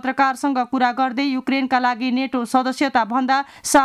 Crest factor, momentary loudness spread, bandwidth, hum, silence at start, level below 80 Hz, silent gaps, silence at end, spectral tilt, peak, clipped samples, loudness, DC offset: 14 dB; 3 LU; 14.5 kHz; none; 0.05 s; -58 dBFS; none; 0 s; -2.5 dB/octave; -4 dBFS; under 0.1%; -20 LUFS; under 0.1%